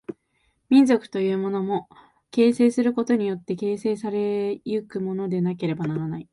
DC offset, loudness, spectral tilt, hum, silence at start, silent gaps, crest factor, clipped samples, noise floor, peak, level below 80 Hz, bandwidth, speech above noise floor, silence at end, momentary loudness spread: under 0.1%; -23 LUFS; -7.5 dB/octave; none; 0.1 s; none; 18 dB; under 0.1%; -69 dBFS; -6 dBFS; -66 dBFS; 11.5 kHz; 46 dB; 0.1 s; 10 LU